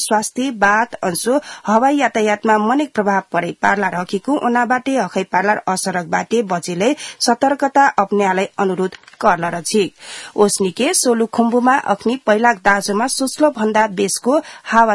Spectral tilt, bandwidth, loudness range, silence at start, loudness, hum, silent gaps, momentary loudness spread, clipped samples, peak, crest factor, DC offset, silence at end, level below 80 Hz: -3.5 dB/octave; 12 kHz; 2 LU; 0 s; -16 LUFS; none; none; 6 LU; under 0.1%; 0 dBFS; 16 dB; under 0.1%; 0 s; -56 dBFS